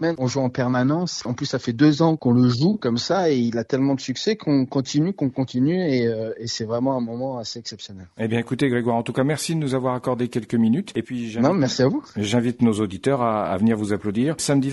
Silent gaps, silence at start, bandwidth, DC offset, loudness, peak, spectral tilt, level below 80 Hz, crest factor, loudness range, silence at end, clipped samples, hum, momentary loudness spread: none; 0 s; 11.5 kHz; under 0.1%; -22 LUFS; -4 dBFS; -6 dB/octave; -58 dBFS; 18 dB; 4 LU; 0 s; under 0.1%; none; 9 LU